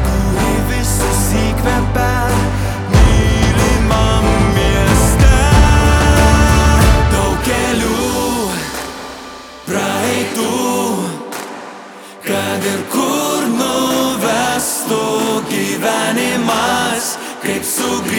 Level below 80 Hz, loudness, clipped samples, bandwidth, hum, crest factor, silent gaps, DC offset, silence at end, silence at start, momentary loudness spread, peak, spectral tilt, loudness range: -18 dBFS; -14 LUFS; under 0.1%; 19 kHz; none; 14 dB; none; under 0.1%; 0 s; 0 s; 11 LU; 0 dBFS; -4.5 dB/octave; 7 LU